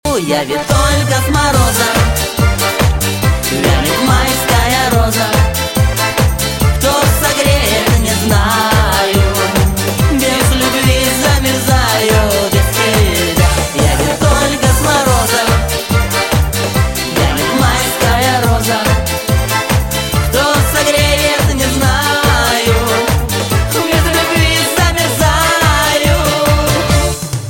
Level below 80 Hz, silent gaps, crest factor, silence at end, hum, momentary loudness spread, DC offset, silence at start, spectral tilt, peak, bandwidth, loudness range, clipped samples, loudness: -20 dBFS; none; 12 dB; 0 s; none; 3 LU; under 0.1%; 0.05 s; -4 dB/octave; 0 dBFS; 17 kHz; 1 LU; under 0.1%; -12 LUFS